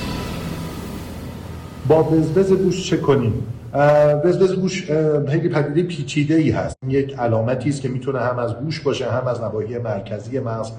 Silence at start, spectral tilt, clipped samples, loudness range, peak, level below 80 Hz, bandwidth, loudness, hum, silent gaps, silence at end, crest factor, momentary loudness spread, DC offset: 0 s; -7 dB/octave; under 0.1%; 5 LU; -6 dBFS; -44 dBFS; 17 kHz; -20 LUFS; none; none; 0 s; 14 dB; 13 LU; under 0.1%